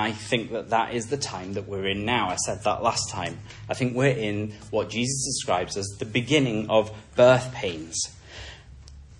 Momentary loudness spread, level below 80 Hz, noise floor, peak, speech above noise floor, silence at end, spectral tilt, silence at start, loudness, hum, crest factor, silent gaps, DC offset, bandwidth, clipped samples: 10 LU; -52 dBFS; -45 dBFS; -6 dBFS; 20 dB; 0.05 s; -4 dB/octave; 0 s; -25 LUFS; none; 20 dB; none; under 0.1%; 11.5 kHz; under 0.1%